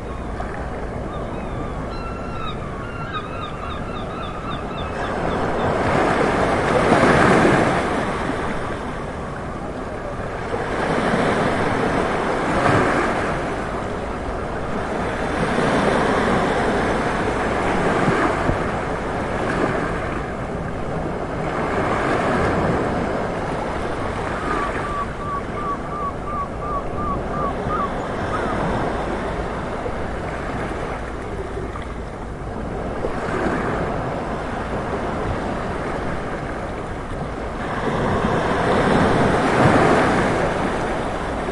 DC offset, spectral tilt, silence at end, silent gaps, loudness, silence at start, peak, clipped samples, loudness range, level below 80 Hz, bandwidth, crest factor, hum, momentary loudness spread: 0.2%; -6 dB/octave; 0 s; none; -22 LUFS; 0 s; 0 dBFS; under 0.1%; 9 LU; -34 dBFS; 11.5 kHz; 20 dB; none; 11 LU